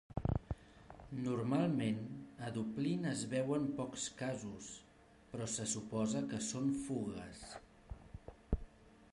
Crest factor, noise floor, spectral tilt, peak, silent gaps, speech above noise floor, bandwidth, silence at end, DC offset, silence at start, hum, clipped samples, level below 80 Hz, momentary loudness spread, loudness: 20 dB; -63 dBFS; -5.5 dB/octave; -20 dBFS; none; 24 dB; 11.5 kHz; 0.1 s; under 0.1%; 0.1 s; none; under 0.1%; -54 dBFS; 17 LU; -40 LUFS